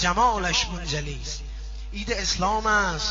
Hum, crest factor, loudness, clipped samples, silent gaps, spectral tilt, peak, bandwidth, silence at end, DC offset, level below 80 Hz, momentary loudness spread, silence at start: none; 16 dB; -24 LUFS; under 0.1%; none; -2 dB/octave; -10 dBFS; 7.6 kHz; 0 s; under 0.1%; -34 dBFS; 14 LU; 0 s